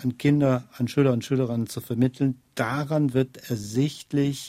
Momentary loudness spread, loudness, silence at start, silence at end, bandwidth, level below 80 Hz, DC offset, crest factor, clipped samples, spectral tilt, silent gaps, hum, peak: 7 LU; -25 LUFS; 0 s; 0 s; 16 kHz; -60 dBFS; under 0.1%; 16 dB; under 0.1%; -7 dB/octave; none; none; -8 dBFS